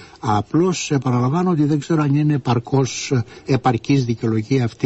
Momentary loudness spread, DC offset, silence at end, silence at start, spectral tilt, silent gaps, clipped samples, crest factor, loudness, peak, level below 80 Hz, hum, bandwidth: 4 LU; under 0.1%; 0 s; 0 s; -6.5 dB/octave; none; under 0.1%; 16 dB; -19 LUFS; -4 dBFS; -50 dBFS; none; 8.2 kHz